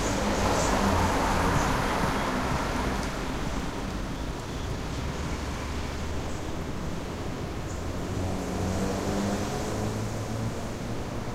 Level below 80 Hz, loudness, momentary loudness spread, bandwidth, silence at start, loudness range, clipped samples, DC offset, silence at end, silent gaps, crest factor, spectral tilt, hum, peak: -36 dBFS; -30 LUFS; 9 LU; 16 kHz; 0 s; 7 LU; under 0.1%; under 0.1%; 0 s; none; 18 dB; -5 dB/octave; none; -12 dBFS